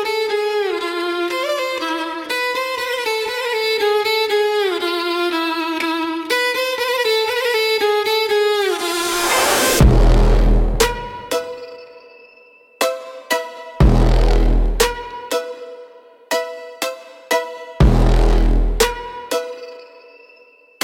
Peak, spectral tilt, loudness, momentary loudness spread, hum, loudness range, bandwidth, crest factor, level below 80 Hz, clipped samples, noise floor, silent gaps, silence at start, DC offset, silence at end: -2 dBFS; -4.5 dB/octave; -18 LUFS; 12 LU; none; 6 LU; 17 kHz; 16 dB; -22 dBFS; under 0.1%; -49 dBFS; none; 0 s; under 0.1%; 0.95 s